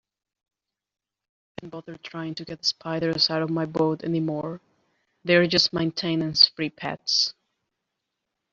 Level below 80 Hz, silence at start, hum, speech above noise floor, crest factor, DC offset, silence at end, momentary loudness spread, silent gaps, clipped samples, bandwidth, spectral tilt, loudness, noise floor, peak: -64 dBFS; 1.6 s; none; 57 dB; 24 dB; under 0.1%; 1.2 s; 20 LU; none; under 0.1%; 7.6 kHz; -4 dB/octave; -23 LUFS; -82 dBFS; -2 dBFS